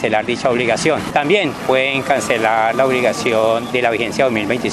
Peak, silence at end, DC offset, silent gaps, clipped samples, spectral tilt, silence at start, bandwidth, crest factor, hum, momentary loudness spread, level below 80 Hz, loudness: 0 dBFS; 0 s; under 0.1%; none; under 0.1%; -4 dB/octave; 0 s; 14 kHz; 16 dB; none; 2 LU; -50 dBFS; -16 LUFS